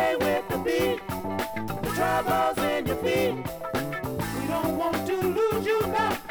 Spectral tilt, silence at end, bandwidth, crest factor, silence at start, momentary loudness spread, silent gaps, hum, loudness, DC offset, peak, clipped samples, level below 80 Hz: -5 dB/octave; 0 s; over 20 kHz; 14 dB; 0 s; 7 LU; none; none; -27 LUFS; under 0.1%; -12 dBFS; under 0.1%; -48 dBFS